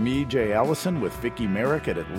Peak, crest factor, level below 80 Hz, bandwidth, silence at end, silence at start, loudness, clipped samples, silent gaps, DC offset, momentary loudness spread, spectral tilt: -8 dBFS; 16 dB; -46 dBFS; 16.5 kHz; 0 s; 0 s; -25 LUFS; under 0.1%; none; under 0.1%; 5 LU; -6 dB/octave